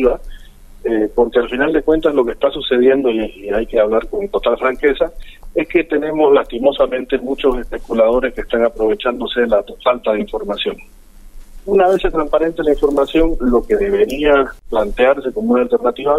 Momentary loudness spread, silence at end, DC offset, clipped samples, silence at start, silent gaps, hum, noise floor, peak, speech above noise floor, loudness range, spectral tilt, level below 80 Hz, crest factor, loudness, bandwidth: 8 LU; 0 s; under 0.1%; under 0.1%; 0 s; none; none; -36 dBFS; -2 dBFS; 21 dB; 3 LU; -6 dB/octave; -32 dBFS; 14 dB; -16 LUFS; 13.5 kHz